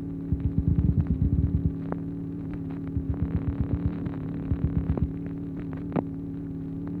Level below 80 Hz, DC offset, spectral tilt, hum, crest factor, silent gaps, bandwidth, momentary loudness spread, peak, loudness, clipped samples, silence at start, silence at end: -34 dBFS; under 0.1%; -12 dB/octave; none; 18 dB; none; 4.2 kHz; 9 LU; -10 dBFS; -29 LUFS; under 0.1%; 0 s; 0 s